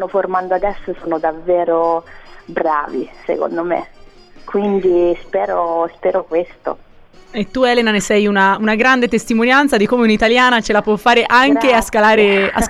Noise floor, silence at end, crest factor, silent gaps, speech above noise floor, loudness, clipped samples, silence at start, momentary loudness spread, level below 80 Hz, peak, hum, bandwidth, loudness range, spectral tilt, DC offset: -39 dBFS; 0 s; 14 dB; none; 25 dB; -14 LUFS; under 0.1%; 0 s; 12 LU; -40 dBFS; -2 dBFS; none; 14 kHz; 7 LU; -4.5 dB/octave; under 0.1%